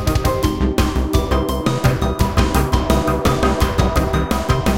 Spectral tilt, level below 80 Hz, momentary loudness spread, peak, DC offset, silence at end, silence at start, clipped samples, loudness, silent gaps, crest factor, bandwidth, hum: -6 dB/octave; -22 dBFS; 2 LU; 0 dBFS; 0.6%; 0 s; 0 s; under 0.1%; -18 LUFS; none; 16 dB; 17 kHz; none